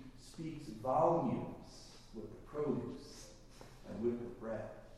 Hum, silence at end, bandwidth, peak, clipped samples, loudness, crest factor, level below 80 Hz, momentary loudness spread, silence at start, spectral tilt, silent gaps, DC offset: none; 0 s; 13 kHz; -20 dBFS; under 0.1%; -39 LUFS; 20 dB; -60 dBFS; 22 LU; 0 s; -7 dB/octave; none; under 0.1%